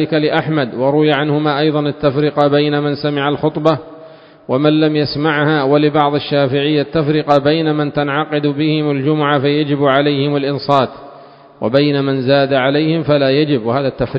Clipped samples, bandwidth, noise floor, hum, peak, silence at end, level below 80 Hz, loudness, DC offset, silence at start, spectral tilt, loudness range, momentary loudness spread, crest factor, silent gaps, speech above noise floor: under 0.1%; 5.8 kHz; -39 dBFS; none; 0 dBFS; 0 s; -50 dBFS; -14 LUFS; under 0.1%; 0 s; -8.5 dB/octave; 1 LU; 4 LU; 14 dB; none; 26 dB